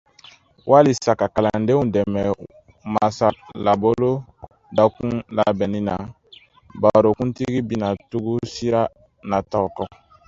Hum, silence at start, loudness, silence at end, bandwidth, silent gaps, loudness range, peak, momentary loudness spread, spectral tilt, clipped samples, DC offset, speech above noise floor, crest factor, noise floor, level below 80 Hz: none; 0.65 s; -20 LUFS; 0.4 s; 7.8 kHz; none; 3 LU; 0 dBFS; 11 LU; -7 dB/octave; under 0.1%; under 0.1%; 30 dB; 20 dB; -50 dBFS; -48 dBFS